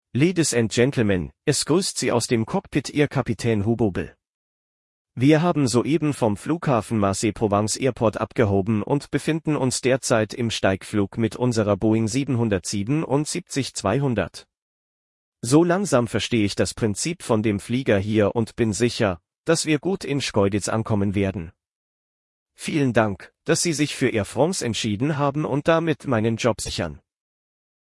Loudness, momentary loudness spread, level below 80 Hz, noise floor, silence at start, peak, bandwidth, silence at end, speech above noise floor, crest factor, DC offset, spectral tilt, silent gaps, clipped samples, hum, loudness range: -22 LUFS; 5 LU; -52 dBFS; under -90 dBFS; 0.15 s; -4 dBFS; 12 kHz; 0.95 s; over 68 dB; 18 dB; under 0.1%; -5 dB/octave; 4.29-5.05 s, 14.62-15.32 s, 19.38-19.44 s, 21.71-22.46 s; under 0.1%; none; 3 LU